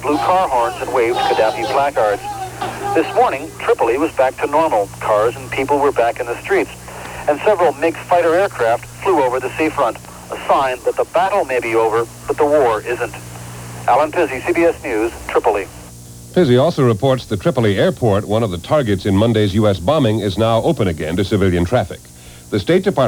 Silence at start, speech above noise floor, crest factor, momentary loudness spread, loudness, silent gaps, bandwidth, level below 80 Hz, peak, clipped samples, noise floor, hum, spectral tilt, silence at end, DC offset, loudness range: 0 s; 20 dB; 14 dB; 9 LU; -16 LUFS; none; over 20 kHz; -42 dBFS; -2 dBFS; under 0.1%; -36 dBFS; 60 Hz at -40 dBFS; -6 dB/octave; 0 s; under 0.1%; 2 LU